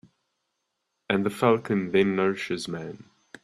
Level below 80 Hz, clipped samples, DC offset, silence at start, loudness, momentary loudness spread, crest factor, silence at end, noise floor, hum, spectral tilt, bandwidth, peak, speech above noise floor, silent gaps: -66 dBFS; under 0.1%; under 0.1%; 1.1 s; -25 LUFS; 12 LU; 20 dB; 0.4 s; -79 dBFS; none; -6 dB/octave; 13.5 kHz; -6 dBFS; 54 dB; none